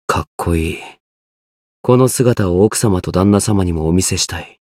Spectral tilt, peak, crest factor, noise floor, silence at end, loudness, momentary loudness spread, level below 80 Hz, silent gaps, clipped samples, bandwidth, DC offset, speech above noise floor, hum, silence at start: -5.5 dB/octave; 0 dBFS; 14 dB; under -90 dBFS; 0.25 s; -15 LUFS; 7 LU; -34 dBFS; 0.27-0.38 s, 1.00-1.84 s; under 0.1%; 16 kHz; under 0.1%; over 76 dB; none; 0.1 s